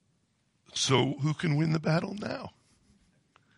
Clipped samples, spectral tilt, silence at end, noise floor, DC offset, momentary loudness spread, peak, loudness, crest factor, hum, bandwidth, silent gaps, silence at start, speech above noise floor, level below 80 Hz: under 0.1%; -5 dB/octave; 1.1 s; -73 dBFS; under 0.1%; 12 LU; -12 dBFS; -29 LUFS; 20 dB; none; 11.5 kHz; none; 0.75 s; 44 dB; -66 dBFS